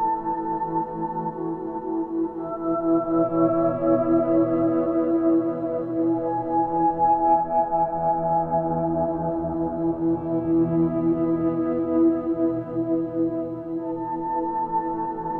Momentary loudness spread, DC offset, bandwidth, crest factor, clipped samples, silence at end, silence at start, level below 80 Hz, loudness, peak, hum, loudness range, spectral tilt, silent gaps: 8 LU; under 0.1%; 2.8 kHz; 14 dB; under 0.1%; 0 s; 0 s; -52 dBFS; -24 LUFS; -8 dBFS; none; 3 LU; -12.5 dB/octave; none